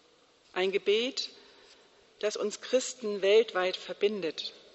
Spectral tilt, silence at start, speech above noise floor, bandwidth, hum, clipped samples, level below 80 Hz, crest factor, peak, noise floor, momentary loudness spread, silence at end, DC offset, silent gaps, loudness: -2.5 dB/octave; 0.55 s; 34 dB; 8.2 kHz; none; under 0.1%; -82 dBFS; 18 dB; -14 dBFS; -63 dBFS; 11 LU; 0.15 s; under 0.1%; none; -30 LUFS